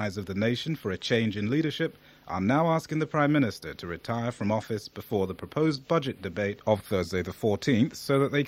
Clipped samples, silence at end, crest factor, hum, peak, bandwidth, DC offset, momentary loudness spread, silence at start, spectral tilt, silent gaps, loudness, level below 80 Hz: under 0.1%; 0 s; 18 dB; none; -10 dBFS; 16 kHz; under 0.1%; 8 LU; 0 s; -6.5 dB/octave; none; -28 LUFS; -60 dBFS